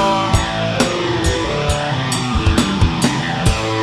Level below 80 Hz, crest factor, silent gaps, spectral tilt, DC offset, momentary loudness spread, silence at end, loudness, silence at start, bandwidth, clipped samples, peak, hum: -26 dBFS; 16 dB; none; -4.5 dB/octave; under 0.1%; 3 LU; 0 s; -17 LUFS; 0 s; 15 kHz; under 0.1%; 0 dBFS; none